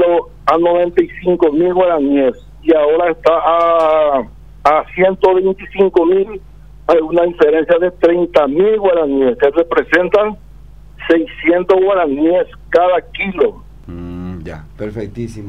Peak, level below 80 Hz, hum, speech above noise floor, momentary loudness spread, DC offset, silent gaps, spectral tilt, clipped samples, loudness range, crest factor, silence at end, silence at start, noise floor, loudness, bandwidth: 0 dBFS; -40 dBFS; 50 Hz at -40 dBFS; 25 dB; 14 LU; 0.8%; none; -7.5 dB/octave; under 0.1%; 2 LU; 14 dB; 0 s; 0 s; -37 dBFS; -13 LUFS; 7.4 kHz